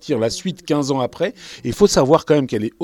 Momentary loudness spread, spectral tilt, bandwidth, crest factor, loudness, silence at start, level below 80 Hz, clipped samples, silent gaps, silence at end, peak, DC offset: 11 LU; -5 dB/octave; 17 kHz; 18 dB; -18 LUFS; 0.05 s; -46 dBFS; under 0.1%; none; 0 s; 0 dBFS; under 0.1%